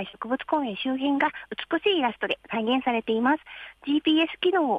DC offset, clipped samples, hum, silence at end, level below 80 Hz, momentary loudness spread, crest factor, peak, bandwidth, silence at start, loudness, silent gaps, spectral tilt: under 0.1%; under 0.1%; none; 0 s; -66 dBFS; 8 LU; 16 dB; -10 dBFS; 5 kHz; 0 s; -25 LUFS; none; -6 dB/octave